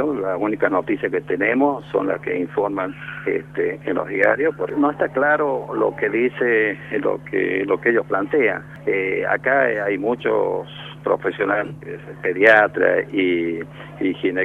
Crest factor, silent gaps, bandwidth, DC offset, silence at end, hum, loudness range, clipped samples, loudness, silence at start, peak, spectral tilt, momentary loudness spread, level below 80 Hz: 20 dB; none; 6.6 kHz; under 0.1%; 0 s; none; 3 LU; under 0.1%; -20 LUFS; 0 s; 0 dBFS; -7.5 dB/octave; 8 LU; -56 dBFS